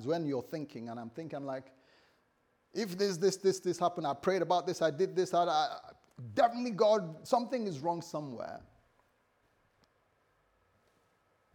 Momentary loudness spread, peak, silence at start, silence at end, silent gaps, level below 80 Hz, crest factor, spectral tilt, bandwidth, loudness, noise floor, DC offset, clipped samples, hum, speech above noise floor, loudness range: 14 LU; -14 dBFS; 0 s; 2.95 s; none; -78 dBFS; 20 dB; -5 dB/octave; 20 kHz; -33 LUFS; -74 dBFS; under 0.1%; under 0.1%; none; 41 dB; 11 LU